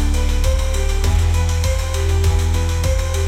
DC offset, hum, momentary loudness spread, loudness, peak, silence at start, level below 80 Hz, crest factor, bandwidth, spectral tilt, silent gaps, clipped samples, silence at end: under 0.1%; none; 3 LU; -19 LUFS; -4 dBFS; 0 s; -18 dBFS; 12 dB; 15.5 kHz; -5 dB/octave; none; under 0.1%; 0 s